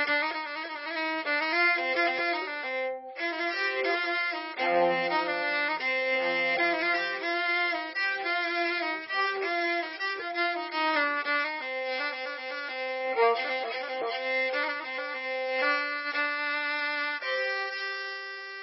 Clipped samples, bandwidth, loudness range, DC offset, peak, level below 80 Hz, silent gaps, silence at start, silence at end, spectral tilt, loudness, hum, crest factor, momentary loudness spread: under 0.1%; 5.8 kHz; 3 LU; under 0.1%; -12 dBFS; -86 dBFS; none; 0 s; 0 s; 1 dB/octave; -28 LUFS; none; 16 dB; 7 LU